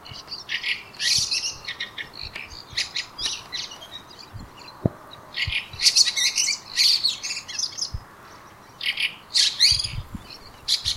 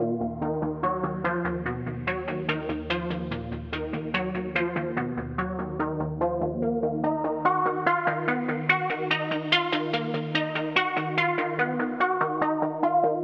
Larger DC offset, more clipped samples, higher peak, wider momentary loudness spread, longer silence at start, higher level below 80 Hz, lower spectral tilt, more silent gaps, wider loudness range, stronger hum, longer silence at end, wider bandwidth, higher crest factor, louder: neither; neither; first, -2 dBFS vs -6 dBFS; first, 22 LU vs 7 LU; about the same, 0 s vs 0 s; about the same, -48 dBFS vs -48 dBFS; second, -0.5 dB/octave vs -7 dB/octave; neither; first, 10 LU vs 5 LU; neither; about the same, 0 s vs 0 s; first, 16 kHz vs 7.4 kHz; about the same, 24 dB vs 20 dB; first, -22 LUFS vs -27 LUFS